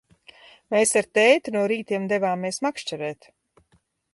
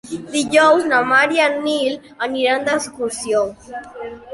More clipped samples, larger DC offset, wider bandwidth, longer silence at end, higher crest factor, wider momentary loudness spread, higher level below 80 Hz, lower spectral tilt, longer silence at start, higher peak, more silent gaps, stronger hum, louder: neither; neither; about the same, 11.5 kHz vs 11.5 kHz; first, 1 s vs 0 s; about the same, 20 dB vs 16 dB; second, 13 LU vs 18 LU; second, -70 dBFS vs -56 dBFS; about the same, -3.5 dB/octave vs -2.5 dB/octave; first, 0.7 s vs 0.05 s; about the same, -4 dBFS vs -2 dBFS; neither; neither; second, -22 LUFS vs -17 LUFS